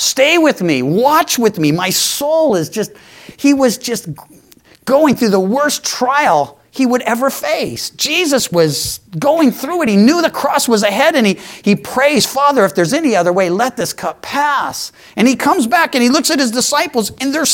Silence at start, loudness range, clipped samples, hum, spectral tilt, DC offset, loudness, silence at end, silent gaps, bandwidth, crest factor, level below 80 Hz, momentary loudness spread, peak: 0 s; 3 LU; under 0.1%; none; -3.5 dB/octave; under 0.1%; -13 LUFS; 0 s; none; 17 kHz; 14 dB; -54 dBFS; 8 LU; 0 dBFS